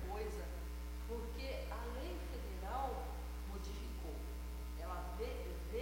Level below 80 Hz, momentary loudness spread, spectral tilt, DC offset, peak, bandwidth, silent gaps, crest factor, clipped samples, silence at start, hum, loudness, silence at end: -46 dBFS; 5 LU; -5.5 dB/octave; under 0.1%; -30 dBFS; 16.5 kHz; none; 14 dB; under 0.1%; 0 s; 60 Hz at -45 dBFS; -46 LUFS; 0 s